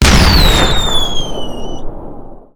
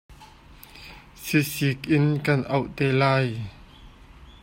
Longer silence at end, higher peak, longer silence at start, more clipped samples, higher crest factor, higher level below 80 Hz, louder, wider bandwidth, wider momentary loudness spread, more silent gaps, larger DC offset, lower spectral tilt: about the same, 0.15 s vs 0.1 s; first, 0 dBFS vs -6 dBFS; about the same, 0 s vs 0.1 s; first, 0.2% vs under 0.1%; second, 12 dB vs 18 dB; first, -16 dBFS vs -52 dBFS; first, -11 LUFS vs -23 LUFS; first, over 20 kHz vs 16.5 kHz; about the same, 22 LU vs 22 LU; neither; neither; second, -4 dB/octave vs -6 dB/octave